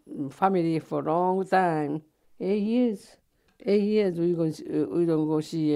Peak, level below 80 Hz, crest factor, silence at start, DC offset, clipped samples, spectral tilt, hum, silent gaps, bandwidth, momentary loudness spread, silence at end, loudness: -8 dBFS; -70 dBFS; 18 dB; 0.1 s; under 0.1%; under 0.1%; -7.5 dB/octave; none; none; 12.5 kHz; 9 LU; 0 s; -26 LUFS